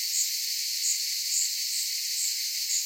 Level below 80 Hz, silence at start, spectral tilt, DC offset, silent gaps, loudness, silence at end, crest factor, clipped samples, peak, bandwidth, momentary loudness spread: under -90 dBFS; 0 s; 14 dB/octave; under 0.1%; none; -26 LUFS; 0 s; 16 dB; under 0.1%; -14 dBFS; 16.5 kHz; 2 LU